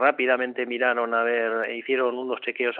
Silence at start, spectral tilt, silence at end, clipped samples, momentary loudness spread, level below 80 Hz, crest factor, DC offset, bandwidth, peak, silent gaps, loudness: 0 s; 0 dB/octave; 0 s; under 0.1%; 5 LU; under -90 dBFS; 18 dB; under 0.1%; 4.3 kHz; -6 dBFS; none; -24 LUFS